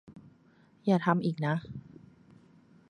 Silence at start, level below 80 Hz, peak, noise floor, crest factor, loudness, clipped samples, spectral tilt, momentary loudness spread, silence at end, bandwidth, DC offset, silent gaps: 0.1 s; -68 dBFS; -10 dBFS; -62 dBFS; 24 dB; -30 LUFS; under 0.1%; -8.5 dB/octave; 18 LU; 1.1 s; 9.2 kHz; under 0.1%; none